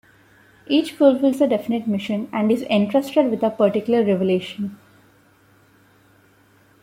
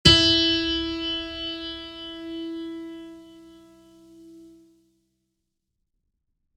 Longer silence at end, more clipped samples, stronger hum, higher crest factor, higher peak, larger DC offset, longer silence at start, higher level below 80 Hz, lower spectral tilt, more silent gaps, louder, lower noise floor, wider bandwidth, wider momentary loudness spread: about the same, 2.1 s vs 2.1 s; neither; neither; second, 18 dB vs 26 dB; about the same, -4 dBFS vs -2 dBFS; neither; first, 0.7 s vs 0.05 s; second, -64 dBFS vs -44 dBFS; first, -7 dB/octave vs -3.5 dB/octave; neither; first, -20 LUFS vs -23 LUFS; second, -55 dBFS vs -79 dBFS; first, 16 kHz vs 12.5 kHz; second, 8 LU vs 21 LU